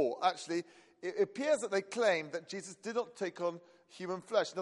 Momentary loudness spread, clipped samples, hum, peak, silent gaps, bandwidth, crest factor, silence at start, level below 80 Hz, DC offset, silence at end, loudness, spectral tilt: 12 LU; under 0.1%; none; -16 dBFS; none; 11.5 kHz; 20 dB; 0 s; -86 dBFS; under 0.1%; 0 s; -35 LUFS; -3.5 dB/octave